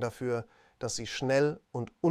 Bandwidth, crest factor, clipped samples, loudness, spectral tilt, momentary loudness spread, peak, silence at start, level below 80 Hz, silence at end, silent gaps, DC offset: 15 kHz; 18 dB; under 0.1%; -32 LUFS; -5 dB/octave; 12 LU; -14 dBFS; 0 s; -62 dBFS; 0 s; none; under 0.1%